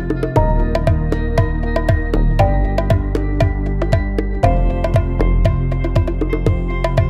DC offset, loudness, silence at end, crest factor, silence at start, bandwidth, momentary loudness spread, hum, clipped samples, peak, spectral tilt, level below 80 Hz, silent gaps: under 0.1%; -18 LUFS; 0 s; 14 dB; 0 s; 7.8 kHz; 3 LU; none; under 0.1%; -2 dBFS; -8.5 dB/octave; -18 dBFS; none